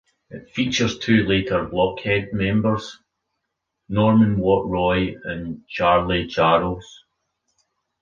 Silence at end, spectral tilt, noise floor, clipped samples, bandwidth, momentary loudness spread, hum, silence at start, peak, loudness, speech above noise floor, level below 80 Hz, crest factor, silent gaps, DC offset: 1.05 s; -6 dB/octave; -79 dBFS; under 0.1%; 7.2 kHz; 13 LU; none; 0.3 s; -4 dBFS; -20 LUFS; 59 dB; -44 dBFS; 18 dB; none; under 0.1%